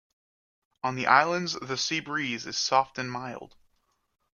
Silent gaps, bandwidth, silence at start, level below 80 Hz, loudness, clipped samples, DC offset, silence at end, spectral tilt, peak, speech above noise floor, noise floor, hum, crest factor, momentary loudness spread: none; 10 kHz; 0.85 s; -70 dBFS; -27 LUFS; under 0.1%; under 0.1%; 0.9 s; -3 dB/octave; -4 dBFS; 45 dB; -72 dBFS; none; 26 dB; 13 LU